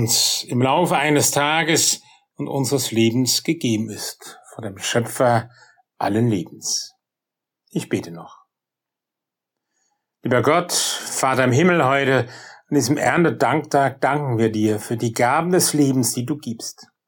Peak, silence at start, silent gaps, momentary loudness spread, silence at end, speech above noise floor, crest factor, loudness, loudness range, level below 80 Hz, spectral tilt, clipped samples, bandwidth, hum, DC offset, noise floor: -6 dBFS; 0 s; none; 14 LU; 0.25 s; 66 dB; 14 dB; -19 LUFS; 8 LU; -64 dBFS; -4 dB/octave; under 0.1%; 17.5 kHz; none; under 0.1%; -86 dBFS